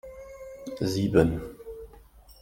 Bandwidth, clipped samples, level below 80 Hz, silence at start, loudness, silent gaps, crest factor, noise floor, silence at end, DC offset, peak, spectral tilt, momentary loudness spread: 17 kHz; under 0.1%; -48 dBFS; 0.05 s; -26 LUFS; none; 22 dB; -52 dBFS; 0.1 s; under 0.1%; -6 dBFS; -7 dB/octave; 22 LU